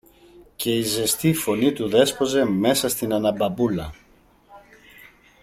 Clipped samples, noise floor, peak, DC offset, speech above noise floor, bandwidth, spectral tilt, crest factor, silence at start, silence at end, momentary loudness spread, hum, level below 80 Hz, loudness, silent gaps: under 0.1%; -56 dBFS; -4 dBFS; under 0.1%; 35 dB; 16.5 kHz; -4.5 dB/octave; 20 dB; 0.4 s; 0.85 s; 5 LU; none; -52 dBFS; -21 LUFS; none